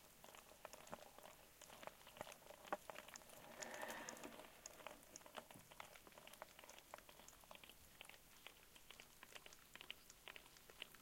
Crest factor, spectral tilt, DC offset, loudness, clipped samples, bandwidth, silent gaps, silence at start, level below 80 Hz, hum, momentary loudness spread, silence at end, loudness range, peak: 30 dB; -1.5 dB/octave; under 0.1%; -58 LUFS; under 0.1%; 16.5 kHz; none; 0 s; -78 dBFS; none; 10 LU; 0 s; 6 LU; -30 dBFS